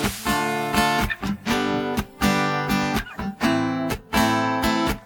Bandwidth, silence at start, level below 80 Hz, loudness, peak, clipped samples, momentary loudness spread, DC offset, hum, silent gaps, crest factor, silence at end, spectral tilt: 19 kHz; 0 s; -38 dBFS; -23 LUFS; -6 dBFS; under 0.1%; 6 LU; under 0.1%; none; none; 16 dB; 0 s; -4.5 dB/octave